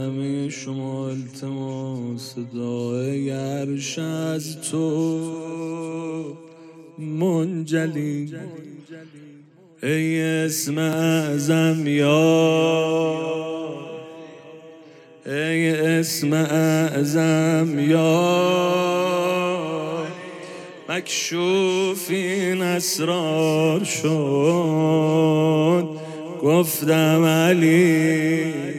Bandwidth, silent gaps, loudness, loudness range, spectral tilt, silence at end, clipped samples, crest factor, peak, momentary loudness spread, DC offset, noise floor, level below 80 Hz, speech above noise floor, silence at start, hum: 16 kHz; none; -21 LUFS; 8 LU; -5.5 dB/octave; 0 s; under 0.1%; 16 dB; -6 dBFS; 15 LU; under 0.1%; -49 dBFS; -74 dBFS; 28 dB; 0 s; none